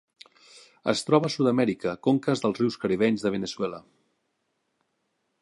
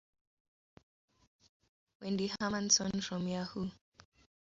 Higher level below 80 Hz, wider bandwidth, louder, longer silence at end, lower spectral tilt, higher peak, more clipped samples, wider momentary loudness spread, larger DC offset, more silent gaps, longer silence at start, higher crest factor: about the same, -66 dBFS vs -68 dBFS; first, 11.5 kHz vs 7.6 kHz; first, -26 LUFS vs -34 LUFS; first, 1.6 s vs 0.75 s; first, -6 dB/octave vs -4 dB/octave; first, -6 dBFS vs -14 dBFS; neither; second, 9 LU vs 13 LU; neither; neither; second, 0.85 s vs 2 s; about the same, 20 dB vs 24 dB